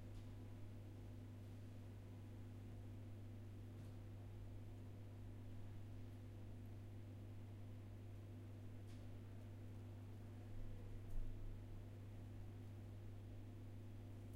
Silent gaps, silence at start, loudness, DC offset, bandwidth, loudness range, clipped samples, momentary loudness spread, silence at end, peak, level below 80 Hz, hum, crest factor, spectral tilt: none; 0 s; -57 LUFS; under 0.1%; 16 kHz; 1 LU; under 0.1%; 1 LU; 0 s; -36 dBFS; -60 dBFS; none; 18 dB; -7.5 dB/octave